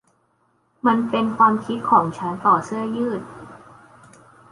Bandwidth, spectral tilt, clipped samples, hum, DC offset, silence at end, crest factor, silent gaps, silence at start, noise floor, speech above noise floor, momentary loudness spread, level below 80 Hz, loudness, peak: 11.5 kHz; -6.5 dB/octave; under 0.1%; none; under 0.1%; 0.95 s; 20 dB; none; 0.85 s; -65 dBFS; 45 dB; 10 LU; -62 dBFS; -20 LUFS; -2 dBFS